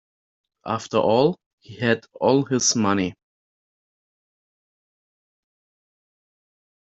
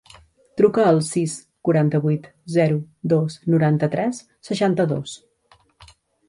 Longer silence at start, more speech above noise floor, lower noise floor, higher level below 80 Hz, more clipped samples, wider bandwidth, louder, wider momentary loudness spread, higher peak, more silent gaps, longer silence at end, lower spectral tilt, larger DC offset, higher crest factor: about the same, 0.65 s vs 0.55 s; first, over 69 dB vs 38 dB; first, under -90 dBFS vs -58 dBFS; second, -66 dBFS vs -60 dBFS; neither; second, 8 kHz vs 11.5 kHz; about the same, -21 LUFS vs -21 LUFS; about the same, 11 LU vs 11 LU; about the same, -4 dBFS vs -4 dBFS; first, 1.46-1.58 s vs none; first, 3.85 s vs 1.1 s; second, -4.5 dB/octave vs -7 dB/octave; neither; about the same, 22 dB vs 18 dB